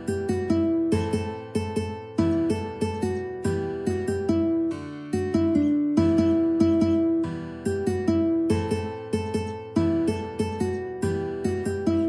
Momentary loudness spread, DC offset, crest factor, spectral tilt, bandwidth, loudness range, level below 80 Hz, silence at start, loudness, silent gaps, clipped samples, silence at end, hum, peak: 8 LU; under 0.1%; 16 dB; -7.5 dB/octave; 11 kHz; 4 LU; -50 dBFS; 0 s; -25 LUFS; none; under 0.1%; 0 s; none; -8 dBFS